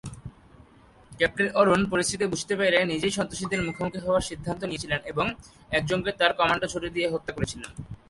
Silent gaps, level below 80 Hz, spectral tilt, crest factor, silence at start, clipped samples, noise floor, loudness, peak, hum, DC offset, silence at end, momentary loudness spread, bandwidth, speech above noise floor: none; -50 dBFS; -4 dB/octave; 20 dB; 0.05 s; under 0.1%; -54 dBFS; -26 LUFS; -6 dBFS; none; under 0.1%; 0.15 s; 10 LU; 11.5 kHz; 28 dB